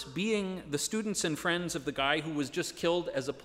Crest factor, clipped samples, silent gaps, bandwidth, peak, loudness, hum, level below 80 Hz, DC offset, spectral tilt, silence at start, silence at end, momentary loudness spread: 20 dB; under 0.1%; none; 16 kHz; -12 dBFS; -32 LUFS; none; -62 dBFS; under 0.1%; -3.5 dB/octave; 0 s; 0 s; 5 LU